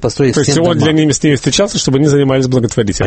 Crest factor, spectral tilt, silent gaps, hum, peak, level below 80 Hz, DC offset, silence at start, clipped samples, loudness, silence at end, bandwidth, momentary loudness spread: 12 dB; -5 dB/octave; none; none; 0 dBFS; -36 dBFS; under 0.1%; 0 s; under 0.1%; -11 LUFS; 0 s; 8.8 kHz; 2 LU